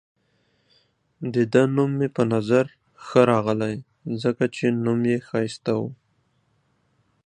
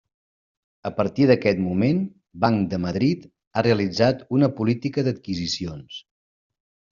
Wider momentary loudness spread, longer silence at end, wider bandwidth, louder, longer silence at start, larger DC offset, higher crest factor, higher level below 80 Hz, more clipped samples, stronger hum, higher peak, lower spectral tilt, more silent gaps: about the same, 12 LU vs 13 LU; first, 1.3 s vs 0.9 s; first, 9.8 kHz vs 7.4 kHz; about the same, -23 LUFS vs -22 LUFS; first, 1.2 s vs 0.85 s; neither; about the same, 22 dB vs 20 dB; second, -64 dBFS vs -56 dBFS; neither; neither; about the same, -2 dBFS vs -4 dBFS; first, -7.5 dB/octave vs -6 dB/octave; second, none vs 3.47-3.51 s